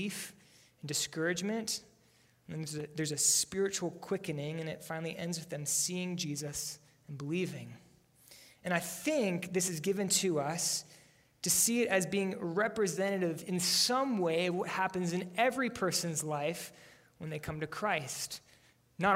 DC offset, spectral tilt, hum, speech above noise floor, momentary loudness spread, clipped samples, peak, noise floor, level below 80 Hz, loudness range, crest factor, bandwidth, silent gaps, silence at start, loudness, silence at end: under 0.1%; -3 dB/octave; none; 33 dB; 14 LU; under 0.1%; -14 dBFS; -67 dBFS; -70 dBFS; 6 LU; 20 dB; 16 kHz; none; 0 s; -33 LUFS; 0 s